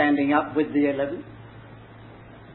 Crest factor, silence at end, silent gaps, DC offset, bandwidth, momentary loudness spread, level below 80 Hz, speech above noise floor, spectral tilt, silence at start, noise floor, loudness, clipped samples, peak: 18 dB; 0 s; none; under 0.1%; 4.2 kHz; 24 LU; -58 dBFS; 22 dB; -10.5 dB/octave; 0 s; -45 dBFS; -23 LUFS; under 0.1%; -6 dBFS